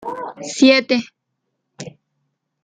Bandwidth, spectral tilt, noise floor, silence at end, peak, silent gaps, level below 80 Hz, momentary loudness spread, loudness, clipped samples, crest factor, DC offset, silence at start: 9.4 kHz; -3 dB/octave; -75 dBFS; 0.75 s; -2 dBFS; none; -66 dBFS; 24 LU; -15 LUFS; under 0.1%; 18 dB; under 0.1%; 0 s